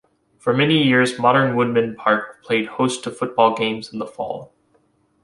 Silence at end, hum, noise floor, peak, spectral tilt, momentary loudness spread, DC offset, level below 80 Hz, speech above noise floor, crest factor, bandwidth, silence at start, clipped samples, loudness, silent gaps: 0.8 s; none; -61 dBFS; -2 dBFS; -5.5 dB/octave; 12 LU; under 0.1%; -62 dBFS; 43 dB; 18 dB; 11.5 kHz; 0.45 s; under 0.1%; -19 LUFS; none